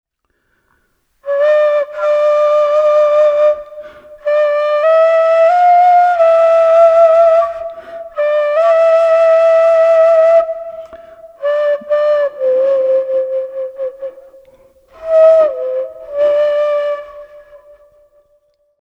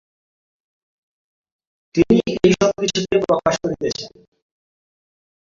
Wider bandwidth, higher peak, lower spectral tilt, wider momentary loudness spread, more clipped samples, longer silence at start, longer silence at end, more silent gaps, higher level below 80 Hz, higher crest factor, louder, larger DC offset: about the same, 7.6 kHz vs 7.6 kHz; about the same, 0 dBFS vs -2 dBFS; second, -2.5 dB/octave vs -5 dB/octave; first, 15 LU vs 10 LU; neither; second, 1.25 s vs 1.95 s; about the same, 1.45 s vs 1.4 s; neither; second, -56 dBFS vs -48 dBFS; second, 12 dB vs 20 dB; first, -11 LUFS vs -18 LUFS; neither